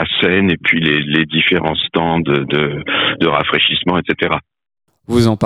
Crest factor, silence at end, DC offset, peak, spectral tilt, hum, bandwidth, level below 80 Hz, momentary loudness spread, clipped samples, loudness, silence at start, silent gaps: 14 dB; 0 s; under 0.1%; 0 dBFS; -6 dB/octave; none; 13 kHz; -44 dBFS; 4 LU; under 0.1%; -14 LUFS; 0 s; none